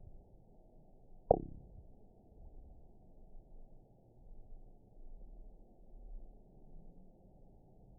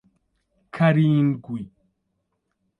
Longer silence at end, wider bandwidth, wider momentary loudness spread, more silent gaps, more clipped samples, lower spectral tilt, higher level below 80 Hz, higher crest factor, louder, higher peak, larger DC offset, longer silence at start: second, 0 s vs 1.1 s; second, 1 kHz vs 4.7 kHz; second, 17 LU vs 21 LU; neither; neither; second, 2.5 dB/octave vs -9.5 dB/octave; first, -54 dBFS vs -62 dBFS; first, 38 dB vs 18 dB; second, -36 LUFS vs -20 LUFS; second, -10 dBFS vs -6 dBFS; neither; second, 0 s vs 0.75 s